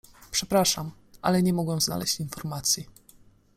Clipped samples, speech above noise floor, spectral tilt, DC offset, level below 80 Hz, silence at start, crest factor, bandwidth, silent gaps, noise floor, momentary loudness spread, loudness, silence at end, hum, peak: under 0.1%; 30 dB; -4 dB/octave; under 0.1%; -54 dBFS; 0.2 s; 20 dB; 16 kHz; none; -56 dBFS; 9 LU; -26 LUFS; 0.65 s; none; -8 dBFS